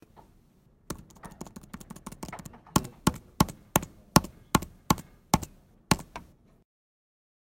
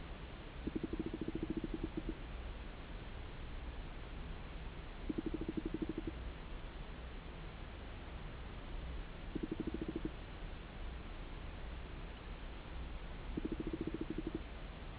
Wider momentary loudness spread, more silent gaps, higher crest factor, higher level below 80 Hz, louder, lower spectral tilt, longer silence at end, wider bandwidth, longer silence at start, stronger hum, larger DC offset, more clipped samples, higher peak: first, 20 LU vs 8 LU; neither; first, 32 dB vs 18 dB; about the same, -46 dBFS vs -48 dBFS; first, -29 LUFS vs -47 LUFS; second, -4.5 dB/octave vs -6 dB/octave; first, 1.2 s vs 0 s; first, 16.5 kHz vs 4 kHz; first, 0.9 s vs 0 s; neither; neither; neither; first, 0 dBFS vs -26 dBFS